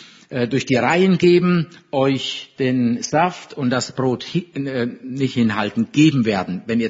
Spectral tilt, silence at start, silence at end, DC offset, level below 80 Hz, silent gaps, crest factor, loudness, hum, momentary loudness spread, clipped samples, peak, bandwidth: -6 dB/octave; 0 s; 0 s; under 0.1%; -60 dBFS; none; 16 dB; -19 LUFS; none; 10 LU; under 0.1%; -2 dBFS; 7.8 kHz